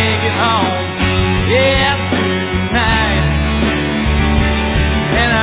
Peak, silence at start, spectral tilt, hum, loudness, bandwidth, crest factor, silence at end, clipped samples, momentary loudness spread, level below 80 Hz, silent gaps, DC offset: 0 dBFS; 0 s; -9.5 dB/octave; none; -14 LUFS; 4 kHz; 14 dB; 0 s; under 0.1%; 4 LU; -20 dBFS; none; under 0.1%